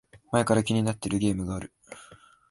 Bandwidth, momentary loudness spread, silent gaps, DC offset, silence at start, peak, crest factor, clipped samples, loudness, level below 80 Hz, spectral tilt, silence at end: 11.5 kHz; 23 LU; none; under 0.1%; 0.15 s; -8 dBFS; 20 dB; under 0.1%; -27 LUFS; -50 dBFS; -6 dB/octave; 0.35 s